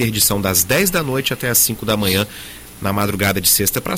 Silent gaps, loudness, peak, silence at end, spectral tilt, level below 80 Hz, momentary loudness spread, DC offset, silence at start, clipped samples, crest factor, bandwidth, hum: none; -16 LUFS; -2 dBFS; 0 s; -3 dB/octave; -40 dBFS; 11 LU; under 0.1%; 0 s; under 0.1%; 16 dB; 17 kHz; none